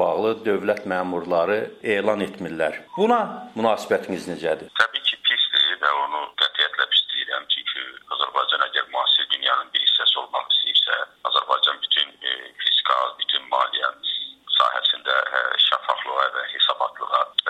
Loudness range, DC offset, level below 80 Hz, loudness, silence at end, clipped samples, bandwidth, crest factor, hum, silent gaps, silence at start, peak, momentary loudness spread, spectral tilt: 4 LU; under 0.1%; -70 dBFS; -21 LUFS; 0 s; under 0.1%; 13.5 kHz; 20 dB; none; none; 0 s; -2 dBFS; 8 LU; -3 dB/octave